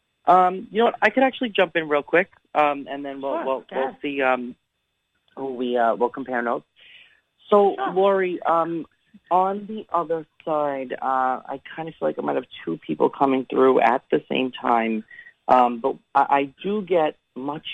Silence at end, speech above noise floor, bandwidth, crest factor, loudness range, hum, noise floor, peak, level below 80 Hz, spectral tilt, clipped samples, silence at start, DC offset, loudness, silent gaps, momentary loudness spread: 0 s; 53 dB; 9 kHz; 18 dB; 5 LU; none; -75 dBFS; -4 dBFS; -70 dBFS; -7 dB/octave; under 0.1%; 0.25 s; under 0.1%; -22 LUFS; none; 12 LU